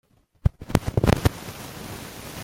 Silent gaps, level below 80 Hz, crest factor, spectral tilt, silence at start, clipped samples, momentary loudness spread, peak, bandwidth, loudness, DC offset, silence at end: none; -34 dBFS; 26 dB; -6 dB/octave; 0.45 s; under 0.1%; 15 LU; 0 dBFS; 17 kHz; -25 LUFS; under 0.1%; 0 s